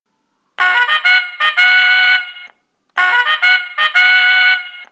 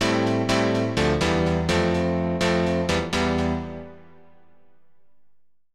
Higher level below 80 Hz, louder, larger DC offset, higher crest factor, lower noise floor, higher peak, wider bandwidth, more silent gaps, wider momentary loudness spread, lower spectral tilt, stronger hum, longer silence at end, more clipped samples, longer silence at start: second, -76 dBFS vs -40 dBFS; first, -10 LUFS vs -23 LUFS; second, under 0.1% vs 0.5%; about the same, 14 dB vs 14 dB; second, -66 dBFS vs -71 dBFS; first, 0 dBFS vs -8 dBFS; second, 8.8 kHz vs 13 kHz; neither; about the same, 7 LU vs 6 LU; second, 2 dB/octave vs -5.5 dB/octave; second, none vs 50 Hz at -55 dBFS; second, 0.1 s vs 1.8 s; neither; first, 0.6 s vs 0 s